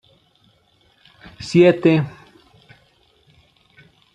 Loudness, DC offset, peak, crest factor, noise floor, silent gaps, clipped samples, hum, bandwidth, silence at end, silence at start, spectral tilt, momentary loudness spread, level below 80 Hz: -16 LUFS; under 0.1%; -2 dBFS; 20 dB; -59 dBFS; none; under 0.1%; none; 9.2 kHz; 2.05 s; 1.4 s; -7.5 dB/octave; 18 LU; -58 dBFS